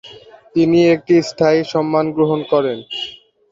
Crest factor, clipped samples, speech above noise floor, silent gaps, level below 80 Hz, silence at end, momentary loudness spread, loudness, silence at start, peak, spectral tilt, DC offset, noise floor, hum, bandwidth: 14 dB; under 0.1%; 26 dB; none; -56 dBFS; 0.4 s; 12 LU; -16 LUFS; 0.05 s; -2 dBFS; -6.5 dB/octave; under 0.1%; -41 dBFS; none; 7.6 kHz